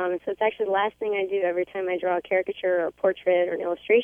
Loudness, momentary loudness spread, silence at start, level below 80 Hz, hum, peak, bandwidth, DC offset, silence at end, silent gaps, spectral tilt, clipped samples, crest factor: -25 LUFS; 5 LU; 0 s; -68 dBFS; none; -10 dBFS; 3.7 kHz; under 0.1%; 0 s; none; -6.5 dB/octave; under 0.1%; 16 dB